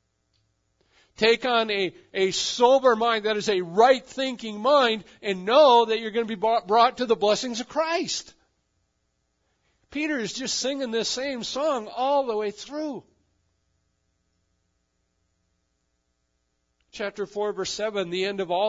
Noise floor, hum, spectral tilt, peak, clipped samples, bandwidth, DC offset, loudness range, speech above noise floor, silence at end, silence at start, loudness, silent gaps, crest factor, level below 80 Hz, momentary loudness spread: -74 dBFS; none; -3 dB/octave; -4 dBFS; under 0.1%; 7.8 kHz; under 0.1%; 13 LU; 51 dB; 0 s; 1.2 s; -24 LUFS; none; 20 dB; -66 dBFS; 12 LU